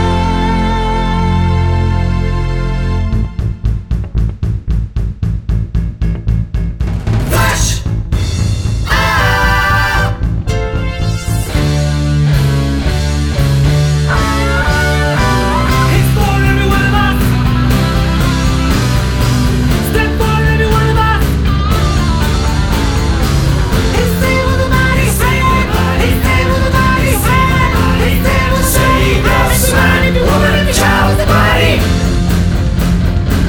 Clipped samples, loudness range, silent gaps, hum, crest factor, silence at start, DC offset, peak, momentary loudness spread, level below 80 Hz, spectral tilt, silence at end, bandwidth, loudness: under 0.1%; 5 LU; none; none; 12 dB; 0 s; under 0.1%; 0 dBFS; 7 LU; -16 dBFS; -5.5 dB/octave; 0 s; 20 kHz; -12 LUFS